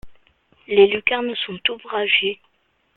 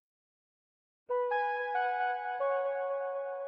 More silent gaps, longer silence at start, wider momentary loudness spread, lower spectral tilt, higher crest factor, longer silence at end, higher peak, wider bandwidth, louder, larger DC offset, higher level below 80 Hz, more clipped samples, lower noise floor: neither; second, 0.05 s vs 1.1 s; first, 10 LU vs 4 LU; first, -7 dB/octave vs -2 dB/octave; first, 20 dB vs 14 dB; first, 0.6 s vs 0 s; first, -2 dBFS vs -22 dBFS; second, 4.2 kHz vs 5.2 kHz; first, -19 LUFS vs -33 LUFS; neither; first, -56 dBFS vs -80 dBFS; neither; second, -58 dBFS vs under -90 dBFS